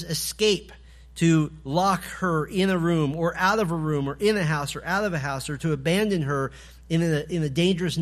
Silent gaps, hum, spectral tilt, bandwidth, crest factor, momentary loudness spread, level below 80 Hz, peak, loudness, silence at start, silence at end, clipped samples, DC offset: none; none; -5.5 dB/octave; 15 kHz; 16 dB; 6 LU; -48 dBFS; -8 dBFS; -24 LUFS; 0 s; 0 s; under 0.1%; under 0.1%